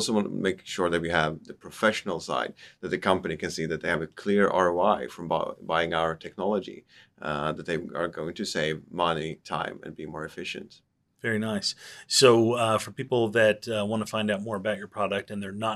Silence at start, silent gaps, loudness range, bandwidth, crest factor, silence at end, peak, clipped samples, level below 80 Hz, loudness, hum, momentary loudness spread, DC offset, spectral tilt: 0 s; none; 7 LU; 13.5 kHz; 24 dB; 0 s; -4 dBFS; under 0.1%; -62 dBFS; -27 LUFS; none; 13 LU; under 0.1%; -4 dB/octave